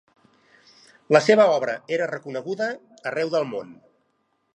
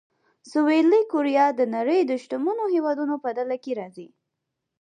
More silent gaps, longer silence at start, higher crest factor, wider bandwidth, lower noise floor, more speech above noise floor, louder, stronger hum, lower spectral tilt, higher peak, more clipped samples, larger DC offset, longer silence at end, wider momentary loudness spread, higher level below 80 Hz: neither; first, 1.1 s vs 0.45 s; first, 22 dB vs 14 dB; about the same, 9.4 kHz vs 9.6 kHz; second, -70 dBFS vs -82 dBFS; second, 48 dB vs 59 dB; about the same, -22 LUFS vs -23 LUFS; neither; about the same, -5 dB/octave vs -5.5 dB/octave; first, -2 dBFS vs -8 dBFS; neither; neither; about the same, 0.85 s vs 0.75 s; first, 14 LU vs 10 LU; about the same, -80 dBFS vs -82 dBFS